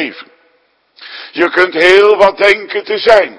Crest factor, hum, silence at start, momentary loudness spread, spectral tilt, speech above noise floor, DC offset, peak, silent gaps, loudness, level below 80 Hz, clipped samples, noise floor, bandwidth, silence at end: 12 dB; none; 0 s; 17 LU; -3.5 dB/octave; 46 dB; under 0.1%; 0 dBFS; none; -9 LUFS; -48 dBFS; 1%; -56 dBFS; 11 kHz; 0.05 s